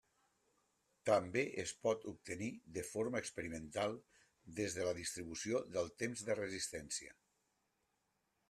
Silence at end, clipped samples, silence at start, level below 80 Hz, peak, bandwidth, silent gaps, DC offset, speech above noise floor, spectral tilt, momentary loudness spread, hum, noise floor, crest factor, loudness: 1.35 s; under 0.1%; 1.05 s; -72 dBFS; -20 dBFS; 13.5 kHz; none; under 0.1%; 43 dB; -4 dB/octave; 9 LU; none; -84 dBFS; 22 dB; -41 LUFS